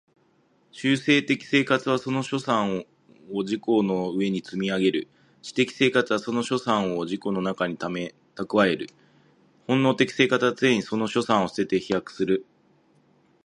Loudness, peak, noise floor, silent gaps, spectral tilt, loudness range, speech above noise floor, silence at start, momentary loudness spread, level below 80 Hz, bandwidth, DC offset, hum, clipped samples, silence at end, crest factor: -24 LUFS; -4 dBFS; -64 dBFS; none; -5.5 dB/octave; 3 LU; 40 dB; 0.75 s; 10 LU; -66 dBFS; 11 kHz; under 0.1%; none; under 0.1%; 1.05 s; 20 dB